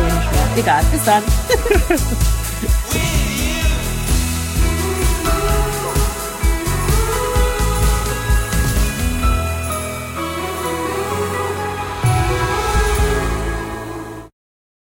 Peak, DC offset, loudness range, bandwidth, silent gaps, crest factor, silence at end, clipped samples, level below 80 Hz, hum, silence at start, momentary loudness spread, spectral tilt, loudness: -2 dBFS; under 0.1%; 4 LU; 17 kHz; none; 16 dB; 0.6 s; under 0.1%; -20 dBFS; none; 0 s; 7 LU; -4.5 dB/octave; -18 LUFS